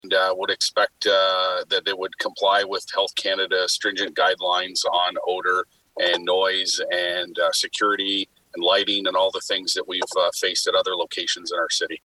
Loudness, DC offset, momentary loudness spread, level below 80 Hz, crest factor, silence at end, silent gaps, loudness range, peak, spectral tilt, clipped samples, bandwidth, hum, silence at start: -22 LUFS; under 0.1%; 5 LU; -70 dBFS; 16 dB; 0.05 s; none; 1 LU; -8 dBFS; -0.5 dB/octave; under 0.1%; 13 kHz; none; 0.05 s